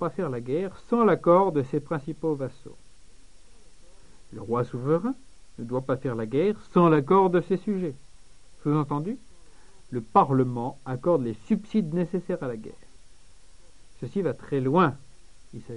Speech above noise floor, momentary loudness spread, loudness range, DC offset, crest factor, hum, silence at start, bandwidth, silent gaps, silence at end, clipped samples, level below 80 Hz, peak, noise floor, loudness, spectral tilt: 29 dB; 16 LU; 7 LU; 0.5%; 22 dB; none; 0 s; 10.5 kHz; none; 0 s; under 0.1%; -54 dBFS; -6 dBFS; -54 dBFS; -26 LUFS; -8.5 dB/octave